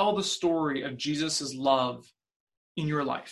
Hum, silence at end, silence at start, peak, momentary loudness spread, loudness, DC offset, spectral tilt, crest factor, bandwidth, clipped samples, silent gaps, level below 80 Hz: none; 0 s; 0 s; -10 dBFS; 8 LU; -29 LUFS; under 0.1%; -4 dB/octave; 20 dB; 12.5 kHz; under 0.1%; 2.36-2.47 s, 2.57-2.75 s; -66 dBFS